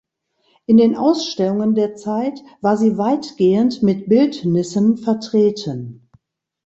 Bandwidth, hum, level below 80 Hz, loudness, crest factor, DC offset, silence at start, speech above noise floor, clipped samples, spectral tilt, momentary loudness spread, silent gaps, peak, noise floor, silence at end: 8 kHz; none; -58 dBFS; -17 LUFS; 14 dB; under 0.1%; 0.7 s; 48 dB; under 0.1%; -7 dB/octave; 10 LU; none; -2 dBFS; -64 dBFS; 0.7 s